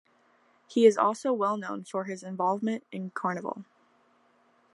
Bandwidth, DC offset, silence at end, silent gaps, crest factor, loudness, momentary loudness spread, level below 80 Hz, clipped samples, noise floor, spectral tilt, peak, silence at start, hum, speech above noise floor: 11.5 kHz; under 0.1%; 1.1 s; none; 22 dB; -28 LUFS; 15 LU; -84 dBFS; under 0.1%; -65 dBFS; -5.5 dB/octave; -8 dBFS; 0.7 s; none; 38 dB